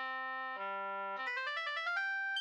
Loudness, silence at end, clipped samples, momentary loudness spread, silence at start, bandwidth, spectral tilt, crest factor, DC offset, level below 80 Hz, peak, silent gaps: -38 LUFS; 0 s; under 0.1%; 5 LU; 0 s; 10.5 kHz; -1.5 dB/octave; 12 dB; under 0.1%; under -90 dBFS; -26 dBFS; none